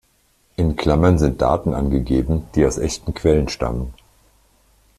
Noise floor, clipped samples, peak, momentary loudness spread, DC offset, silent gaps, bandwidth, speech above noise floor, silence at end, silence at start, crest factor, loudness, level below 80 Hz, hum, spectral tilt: -60 dBFS; under 0.1%; -2 dBFS; 8 LU; under 0.1%; none; 13.5 kHz; 42 dB; 1.05 s; 0.6 s; 18 dB; -19 LUFS; -30 dBFS; none; -6.5 dB/octave